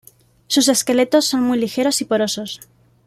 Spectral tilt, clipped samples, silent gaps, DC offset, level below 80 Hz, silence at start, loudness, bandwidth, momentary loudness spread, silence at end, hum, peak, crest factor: -2.5 dB/octave; under 0.1%; none; under 0.1%; -60 dBFS; 0.5 s; -17 LUFS; 16 kHz; 10 LU; 0.5 s; none; -2 dBFS; 16 dB